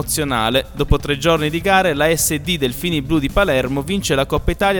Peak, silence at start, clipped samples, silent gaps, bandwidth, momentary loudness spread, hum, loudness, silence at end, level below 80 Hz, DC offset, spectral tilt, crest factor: 0 dBFS; 0 s; under 0.1%; none; 19 kHz; 5 LU; none; -17 LUFS; 0 s; -28 dBFS; under 0.1%; -4 dB/octave; 16 dB